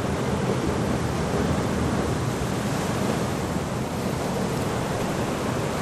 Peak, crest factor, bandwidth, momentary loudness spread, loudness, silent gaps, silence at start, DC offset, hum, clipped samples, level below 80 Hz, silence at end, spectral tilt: -12 dBFS; 14 dB; 15.5 kHz; 3 LU; -26 LUFS; none; 0 s; under 0.1%; none; under 0.1%; -40 dBFS; 0 s; -5.5 dB/octave